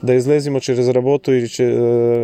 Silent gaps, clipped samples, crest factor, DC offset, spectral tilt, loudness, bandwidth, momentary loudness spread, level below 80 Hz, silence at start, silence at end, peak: none; under 0.1%; 12 dB; under 0.1%; -7 dB/octave; -16 LUFS; 9.6 kHz; 3 LU; -62 dBFS; 0.05 s; 0 s; -4 dBFS